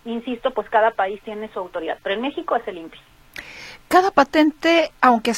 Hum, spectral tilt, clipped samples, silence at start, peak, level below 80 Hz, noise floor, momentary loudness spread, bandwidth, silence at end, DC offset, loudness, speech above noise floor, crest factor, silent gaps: none; -3.5 dB/octave; under 0.1%; 0.05 s; 0 dBFS; -54 dBFS; -40 dBFS; 21 LU; 16.5 kHz; 0 s; under 0.1%; -20 LUFS; 20 dB; 20 dB; none